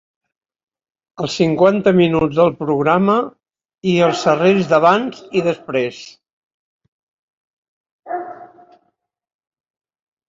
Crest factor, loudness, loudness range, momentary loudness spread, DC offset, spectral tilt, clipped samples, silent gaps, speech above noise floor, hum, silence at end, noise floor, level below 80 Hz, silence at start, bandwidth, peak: 18 dB; -16 LUFS; 21 LU; 14 LU; under 0.1%; -6.5 dB/octave; under 0.1%; 3.65-3.69 s, 6.33-6.80 s, 6.88-7.84 s, 7.91-8.03 s; 52 dB; none; 1.8 s; -67 dBFS; -56 dBFS; 1.2 s; 7.8 kHz; -2 dBFS